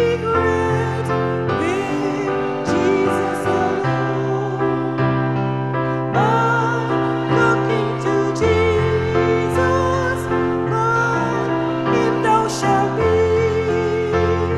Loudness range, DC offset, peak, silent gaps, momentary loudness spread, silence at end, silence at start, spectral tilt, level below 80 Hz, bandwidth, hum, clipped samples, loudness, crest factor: 2 LU; 0.3%; -4 dBFS; none; 4 LU; 0 s; 0 s; -6.5 dB/octave; -40 dBFS; 12 kHz; none; under 0.1%; -18 LUFS; 14 dB